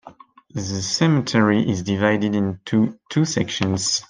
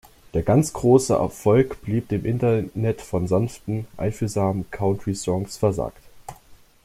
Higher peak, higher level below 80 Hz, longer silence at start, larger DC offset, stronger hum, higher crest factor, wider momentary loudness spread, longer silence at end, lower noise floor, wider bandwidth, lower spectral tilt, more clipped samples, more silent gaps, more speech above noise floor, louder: about the same, -4 dBFS vs -4 dBFS; second, -58 dBFS vs -46 dBFS; second, 0.05 s vs 0.35 s; neither; neither; about the same, 18 dB vs 18 dB; second, 7 LU vs 11 LU; second, 0.1 s vs 0.3 s; second, -46 dBFS vs -50 dBFS; second, 10 kHz vs 15.5 kHz; second, -5 dB/octave vs -7 dB/octave; neither; neither; about the same, 26 dB vs 28 dB; first, -20 LUFS vs -23 LUFS